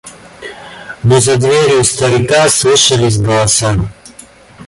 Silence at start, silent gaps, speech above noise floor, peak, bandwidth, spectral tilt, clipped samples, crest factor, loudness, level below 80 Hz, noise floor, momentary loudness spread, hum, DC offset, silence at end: 0.05 s; none; 28 dB; 0 dBFS; 12 kHz; -3.5 dB/octave; under 0.1%; 12 dB; -10 LUFS; -36 dBFS; -38 dBFS; 21 LU; none; under 0.1%; 0 s